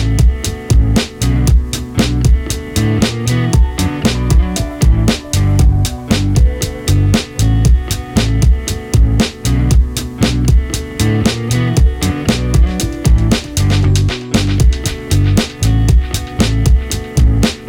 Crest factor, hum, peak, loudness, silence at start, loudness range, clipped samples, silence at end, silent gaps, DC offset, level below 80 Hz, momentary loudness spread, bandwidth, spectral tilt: 12 dB; none; 0 dBFS; -14 LUFS; 0 s; 1 LU; under 0.1%; 0 s; none; under 0.1%; -16 dBFS; 4 LU; 17.5 kHz; -5.5 dB/octave